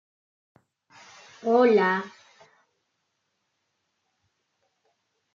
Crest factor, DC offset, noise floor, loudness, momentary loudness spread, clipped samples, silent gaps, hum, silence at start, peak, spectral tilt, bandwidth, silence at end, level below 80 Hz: 22 dB; under 0.1%; -77 dBFS; -22 LUFS; 15 LU; under 0.1%; none; none; 1.45 s; -8 dBFS; -6.5 dB/octave; 7.4 kHz; 3.25 s; -84 dBFS